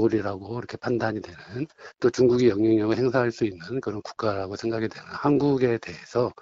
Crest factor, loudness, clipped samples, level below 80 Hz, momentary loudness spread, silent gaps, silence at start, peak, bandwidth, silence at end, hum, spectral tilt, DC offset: 16 dB; -25 LUFS; under 0.1%; -58 dBFS; 14 LU; none; 0 s; -8 dBFS; 7.8 kHz; 0.1 s; none; -7 dB/octave; under 0.1%